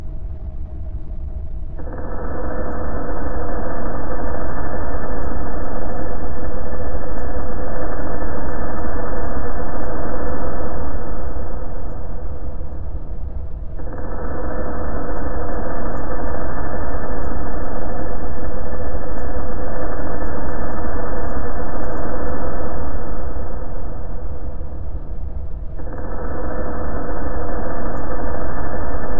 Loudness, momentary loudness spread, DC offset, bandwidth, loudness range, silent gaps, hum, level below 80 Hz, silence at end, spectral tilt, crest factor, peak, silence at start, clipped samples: -28 LUFS; 5 LU; 40%; 1.9 kHz; 4 LU; none; none; -28 dBFS; 0 s; -11 dB/octave; 10 dB; -2 dBFS; 0 s; under 0.1%